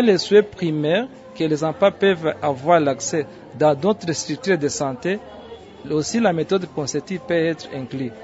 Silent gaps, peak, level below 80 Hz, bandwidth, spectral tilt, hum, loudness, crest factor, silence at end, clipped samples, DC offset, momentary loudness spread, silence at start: none; -2 dBFS; -60 dBFS; 8 kHz; -5 dB/octave; none; -21 LUFS; 18 dB; 0 s; under 0.1%; under 0.1%; 12 LU; 0 s